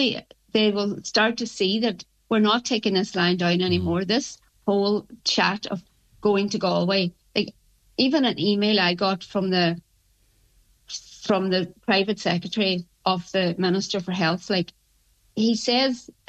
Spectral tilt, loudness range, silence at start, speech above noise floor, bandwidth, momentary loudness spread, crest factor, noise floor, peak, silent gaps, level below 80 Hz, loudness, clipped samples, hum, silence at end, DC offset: -5 dB/octave; 3 LU; 0 s; 40 dB; 8.6 kHz; 10 LU; 18 dB; -63 dBFS; -6 dBFS; none; -60 dBFS; -23 LUFS; under 0.1%; none; 0.3 s; under 0.1%